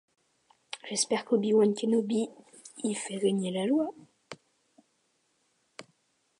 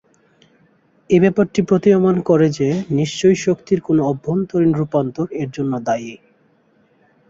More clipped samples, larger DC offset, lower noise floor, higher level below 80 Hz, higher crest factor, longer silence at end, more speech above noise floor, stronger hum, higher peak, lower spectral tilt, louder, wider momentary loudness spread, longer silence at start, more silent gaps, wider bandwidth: neither; neither; first, -74 dBFS vs -57 dBFS; second, -82 dBFS vs -54 dBFS; about the same, 18 dB vs 16 dB; second, 0.6 s vs 1.15 s; first, 46 dB vs 41 dB; neither; second, -14 dBFS vs -2 dBFS; second, -4.5 dB/octave vs -7 dB/octave; second, -29 LUFS vs -17 LUFS; first, 24 LU vs 9 LU; second, 0.75 s vs 1.1 s; neither; first, 11.5 kHz vs 7.8 kHz